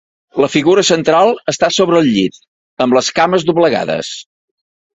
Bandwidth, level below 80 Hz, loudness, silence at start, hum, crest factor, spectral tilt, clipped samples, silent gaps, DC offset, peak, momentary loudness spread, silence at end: 8.2 kHz; -54 dBFS; -13 LUFS; 0.35 s; none; 14 dB; -4 dB/octave; under 0.1%; 2.48-2.77 s; under 0.1%; 0 dBFS; 9 LU; 0.75 s